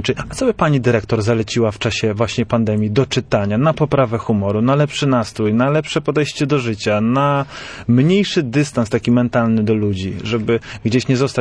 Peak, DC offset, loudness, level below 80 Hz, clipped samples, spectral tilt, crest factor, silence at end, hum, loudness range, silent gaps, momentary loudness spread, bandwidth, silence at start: -4 dBFS; under 0.1%; -17 LUFS; -44 dBFS; under 0.1%; -6.5 dB/octave; 14 dB; 0 s; none; 1 LU; none; 4 LU; 10.5 kHz; 0 s